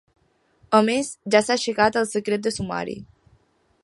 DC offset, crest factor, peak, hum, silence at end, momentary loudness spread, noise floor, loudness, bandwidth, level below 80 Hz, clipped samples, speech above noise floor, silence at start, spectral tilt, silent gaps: under 0.1%; 22 dB; -2 dBFS; none; 0.8 s; 10 LU; -62 dBFS; -22 LUFS; 11.5 kHz; -56 dBFS; under 0.1%; 40 dB; 0.7 s; -4 dB/octave; none